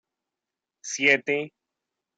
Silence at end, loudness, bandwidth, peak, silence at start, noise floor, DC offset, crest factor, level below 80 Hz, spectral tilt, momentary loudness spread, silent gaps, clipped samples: 0.7 s; -22 LUFS; 9.2 kHz; -6 dBFS; 0.85 s; -88 dBFS; under 0.1%; 24 dB; -82 dBFS; -2 dB/octave; 19 LU; none; under 0.1%